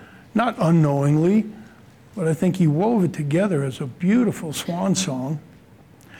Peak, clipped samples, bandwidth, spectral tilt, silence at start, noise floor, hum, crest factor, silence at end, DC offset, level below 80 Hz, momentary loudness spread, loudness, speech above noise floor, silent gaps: -8 dBFS; under 0.1%; 16.5 kHz; -6.5 dB/octave; 0 s; -49 dBFS; none; 12 dB; 0 s; under 0.1%; -60 dBFS; 10 LU; -21 LUFS; 29 dB; none